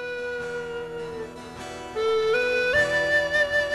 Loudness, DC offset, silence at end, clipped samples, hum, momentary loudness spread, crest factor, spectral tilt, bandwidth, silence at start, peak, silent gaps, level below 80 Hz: -24 LUFS; under 0.1%; 0 s; under 0.1%; none; 15 LU; 16 dB; -3 dB/octave; 13 kHz; 0 s; -10 dBFS; none; -52 dBFS